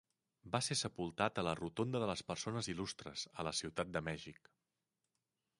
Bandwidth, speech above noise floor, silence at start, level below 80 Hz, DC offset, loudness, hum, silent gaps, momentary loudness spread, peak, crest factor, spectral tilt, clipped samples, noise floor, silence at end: 11.5 kHz; 49 dB; 0.45 s; -66 dBFS; under 0.1%; -41 LUFS; none; none; 8 LU; -18 dBFS; 24 dB; -4 dB/octave; under 0.1%; -89 dBFS; 1.25 s